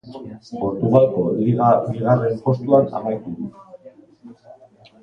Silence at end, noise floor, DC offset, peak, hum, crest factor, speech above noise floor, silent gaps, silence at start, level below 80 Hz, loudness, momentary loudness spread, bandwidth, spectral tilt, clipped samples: 0.5 s; -48 dBFS; under 0.1%; -2 dBFS; none; 18 dB; 30 dB; none; 0.05 s; -54 dBFS; -18 LUFS; 17 LU; 6.6 kHz; -10.5 dB/octave; under 0.1%